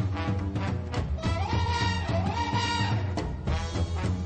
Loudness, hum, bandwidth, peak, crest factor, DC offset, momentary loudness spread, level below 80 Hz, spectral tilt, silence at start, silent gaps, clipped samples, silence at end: -29 LUFS; none; 9 kHz; -14 dBFS; 14 dB; under 0.1%; 5 LU; -36 dBFS; -6 dB/octave; 0 s; none; under 0.1%; 0 s